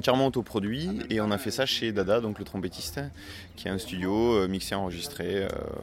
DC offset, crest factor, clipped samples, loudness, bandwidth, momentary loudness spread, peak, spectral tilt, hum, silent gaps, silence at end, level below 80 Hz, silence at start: under 0.1%; 20 dB; under 0.1%; -29 LUFS; 16.5 kHz; 10 LU; -8 dBFS; -5 dB/octave; none; none; 0 s; -50 dBFS; 0 s